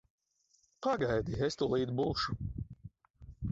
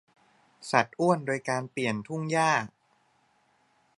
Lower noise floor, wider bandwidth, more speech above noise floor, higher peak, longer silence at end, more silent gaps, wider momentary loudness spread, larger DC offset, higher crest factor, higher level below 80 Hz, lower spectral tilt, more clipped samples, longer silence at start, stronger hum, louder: first, -73 dBFS vs -68 dBFS; second, 8 kHz vs 11.5 kHz; about the same, 40 dB vs 41 dB; second, -20 dBFS vs -4 dBFS; second, 0 s vs 1.3 s; first, 3.10-3.14 s vs none; first, 13 LU vs 8 LU; neither; second, 16 dB vs 26 dB; first, -52 dBFS vs -74 dBFS; about the same, -6 dB/octave vs -5 dB/octave; neither; first, 0.8 s vs 0.6 s; neither; second, -34 LUFS vs -28 LUFS